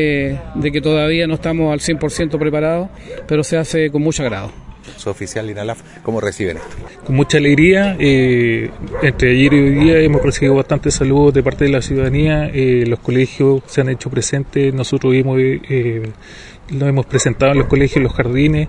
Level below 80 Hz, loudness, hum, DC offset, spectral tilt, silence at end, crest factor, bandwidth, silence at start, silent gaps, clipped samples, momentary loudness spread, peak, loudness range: -32 dBFS; -15 LUFS; none; under 0.1%; -6 dB/octave; 0 s; 14 dB; 11 kHz; 0 s; none; under 0.1%; 13 LU; 0 dBFS; 7 LU